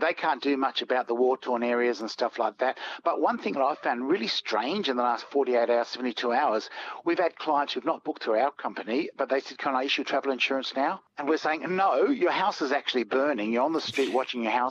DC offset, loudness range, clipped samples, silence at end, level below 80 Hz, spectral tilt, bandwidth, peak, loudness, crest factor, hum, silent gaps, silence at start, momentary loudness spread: under 0.1%; 2 LU; under 0.1%; 0 s; -80 dBFS; -4 dB/octave; 10.5 kHz; -10 dBFS; -27 LUFS; 16 dB; none; none; 0 s; 5 LU